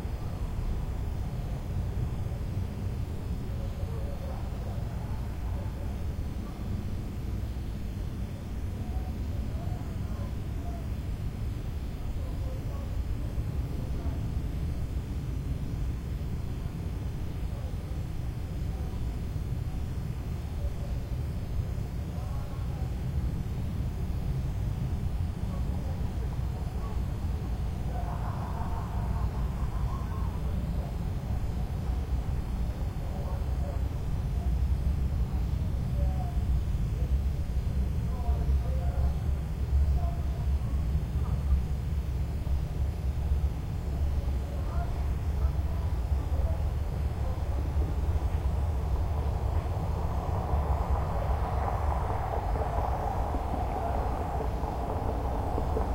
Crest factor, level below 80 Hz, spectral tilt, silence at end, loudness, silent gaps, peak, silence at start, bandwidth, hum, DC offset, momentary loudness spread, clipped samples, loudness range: 14 dB; -32 dBFS; -8 dB/octave; 0 s; -33 LUFS; none; -16 dBFS; 0 s; 16 kHz; none; under 0.1%; 5 LU; under 0.1%; 5 LU